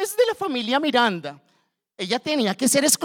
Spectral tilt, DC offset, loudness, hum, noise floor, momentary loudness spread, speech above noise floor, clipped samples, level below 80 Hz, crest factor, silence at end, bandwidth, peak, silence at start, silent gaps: -2.5 dB/octave; under 0.1%; -21 LUFS; none; -67 dBFS; 13 LU; 46 dB; under 0.1%; -72 dBFS; 20 dB; 0 s; 20 kHz; -4 dBFS; 0 s; none